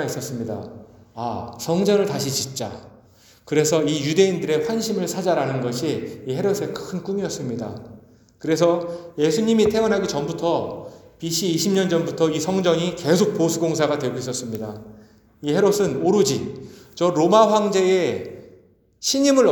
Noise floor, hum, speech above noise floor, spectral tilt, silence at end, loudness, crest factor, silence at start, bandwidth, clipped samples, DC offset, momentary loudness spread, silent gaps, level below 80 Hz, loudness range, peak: -53 dBFS; none; 33 dB; -5 dB/octave; 0 s; -21 LUFS; 20 dB; 0 s; over 20 kHz; under 0.1%; under 0.1%; 14 LU; none; -58 dBFS; 5 LU; -2 dBFS